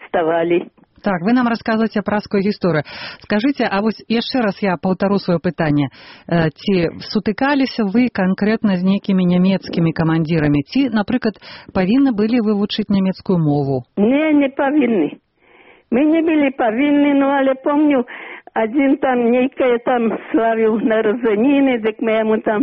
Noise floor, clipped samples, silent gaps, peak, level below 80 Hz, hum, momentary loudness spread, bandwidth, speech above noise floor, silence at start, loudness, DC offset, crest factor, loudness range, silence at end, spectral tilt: -49 dBFS; under 0.1%; none; -4 dBFS; -50 dBFS; none; 6 LU; 6 kHz; 33 dB; 0 s; -17 LUFS; under 0.1%; 12 dB; 2 LU; 0 s; -5.5 dB/octave